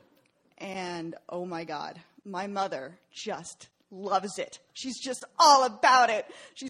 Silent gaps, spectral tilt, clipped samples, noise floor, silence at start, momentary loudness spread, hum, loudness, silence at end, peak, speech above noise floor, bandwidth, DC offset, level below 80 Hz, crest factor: none; -2 dB/octave; under 0.1%; -67 dBFS; 0.6 s; 20 LU; none; -27 LUFS; 0 s; -6 dBFS; 38 dB; 14 kHz; under 0.1%; -78 dBFS; 24 dB